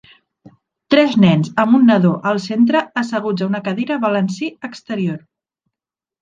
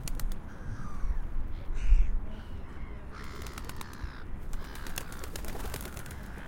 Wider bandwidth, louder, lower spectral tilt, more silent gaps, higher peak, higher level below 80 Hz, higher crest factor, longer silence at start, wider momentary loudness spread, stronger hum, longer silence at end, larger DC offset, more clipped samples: second, 7.6 kHz vs 17 kHz; first, -16 LUFS vs -39 LUFS; first, -7 dB/octave vs -4.5 dB/octave; neither; first, -2 dBFS vs -10 dBFS; second, -60 dBFS vs -32 dBFS; about the same, 16 dB vs 20 dB; first, 0.9 s vs 0 s; about the same, 13 LU vs 13 LU; neither; first, 1.05 s vs 0 s; neither; neither